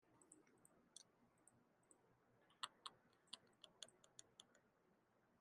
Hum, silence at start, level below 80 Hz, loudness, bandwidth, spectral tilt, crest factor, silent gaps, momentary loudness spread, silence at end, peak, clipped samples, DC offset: none; 0 s; under -90 dBFS; -61 LUFS; 11 kHz; -0.5 dB/octave; 36 dB; none; 13 LU; 0 s; -30 dBFS; under 0.1%; under 0.1%